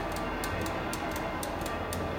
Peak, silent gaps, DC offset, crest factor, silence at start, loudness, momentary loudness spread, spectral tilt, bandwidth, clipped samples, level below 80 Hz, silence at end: -18 dBFS; none; under 0.1%; 14 dB; 0 s; -34 LUFS; 1 LU; -4.5 dB/octave; 17 kHz; under 0.1%; -44 dBFS; 0 s